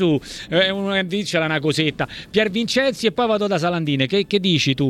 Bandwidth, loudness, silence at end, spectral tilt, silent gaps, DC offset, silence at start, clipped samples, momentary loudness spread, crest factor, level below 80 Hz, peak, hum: 14.5 kHz; -20 LUFS; 0 s; -5 dB/octave; none; under 0.1%; 0 s; under 0.1%; 4 LU; 16 dB; -52 dBFS; -2 dBFS; none